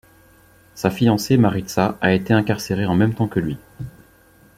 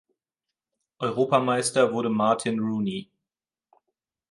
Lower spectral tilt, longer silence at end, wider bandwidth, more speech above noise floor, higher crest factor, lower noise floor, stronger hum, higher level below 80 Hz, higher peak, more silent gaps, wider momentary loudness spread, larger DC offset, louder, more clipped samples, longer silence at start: first, -6.5 dB/octave vs -5 dB/octave; second, 0.7 s vs 1.3 s; first, 16 kHz vs 11.5 kHz; second, 33 dB vs over 66 dB; about the same, 18 dB vs 20 dB; second, -52 dBFS vs under -90 dBFS; neither; first, -50 dBFS vs -70 dBFS; first, -2 dBFS vs -6 dBFS; neither; first, 14 LU vs 9 LU; neither; first, -19 LUFS vs -24 LUFS; neither; second, 0.75 s vs 1 s